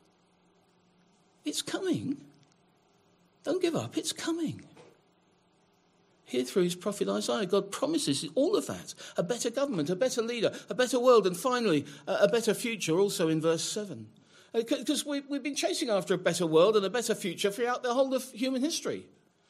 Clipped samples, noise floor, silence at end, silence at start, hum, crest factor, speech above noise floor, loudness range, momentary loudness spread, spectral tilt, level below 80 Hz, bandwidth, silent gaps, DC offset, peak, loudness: under 0.1%; -67 dBFS; 0.45 s; 1.45 s; none; 22 dB; 38 dB; 8 LU; 10 LU; -4 dB/octave; -80 dBFS; 15.5 kHz; none; under 0.1%; -8 dBFS; -29 LUFS